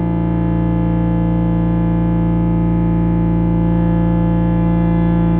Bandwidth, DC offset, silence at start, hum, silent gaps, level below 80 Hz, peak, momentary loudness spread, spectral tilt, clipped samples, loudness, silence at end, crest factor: 3.6 kHz; under 0.1%; 0 s; none; none; -24 dBFS; -6 dBFS; 2 LU; -13 dB/octave; under 0.1%; -16 LUFS; 0 s; 8 dB